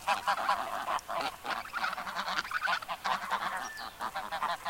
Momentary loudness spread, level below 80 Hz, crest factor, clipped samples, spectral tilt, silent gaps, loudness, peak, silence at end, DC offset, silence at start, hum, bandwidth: 7 LU; -64 dBFS; 20 dB; under 0.1%; -1.5 dB/octave; none; -34 LUFS; -14 dBFS; 0 s; under 0.1%; 0 s; none; 17 kHz